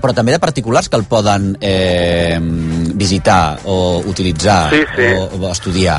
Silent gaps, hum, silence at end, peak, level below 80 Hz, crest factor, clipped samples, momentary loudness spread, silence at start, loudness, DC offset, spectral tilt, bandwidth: none; none; 0 s; 0 dBFS; -32 dBFS; 14 dB; under 0.1%; 6 LU; 0 s; -13 LUFS; under 0.1%; -5 dB/octave; 11.5 kHz